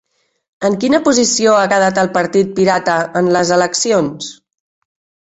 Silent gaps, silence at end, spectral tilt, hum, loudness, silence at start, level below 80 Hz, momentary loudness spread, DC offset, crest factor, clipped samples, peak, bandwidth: none; 1 s; -3.5 dB/octave; none; -13 LUFS; 0.6 s; -54 dBFS; 7 LU; under 0.1%; 14 dB; under 0.1%; -2 dBFS; 8.4 kHz